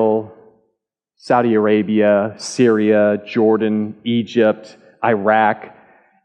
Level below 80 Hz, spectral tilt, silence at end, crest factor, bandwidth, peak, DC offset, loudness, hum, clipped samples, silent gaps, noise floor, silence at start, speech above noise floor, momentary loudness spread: -70 dBFS; -6 dB/octave; 0.55 s; 14 dB; 9.8 kHz; -2 dBFS; under 0.1%; -16 LUFS; none; under 0.1%; none; -74 dBFS; 0 s; 58 dB; 8 LU